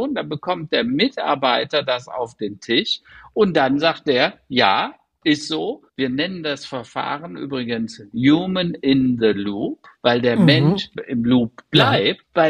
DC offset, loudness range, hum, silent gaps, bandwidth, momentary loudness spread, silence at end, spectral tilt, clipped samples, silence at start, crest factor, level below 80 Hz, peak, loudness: under 0.1%; 5 LU; none; none; 10 kHz; 11 LU; 0 s; -6 dB/octave; under 0.1%; 0 s; 18 dB; -56 dBFS; -2 dBFS; -20 LUFS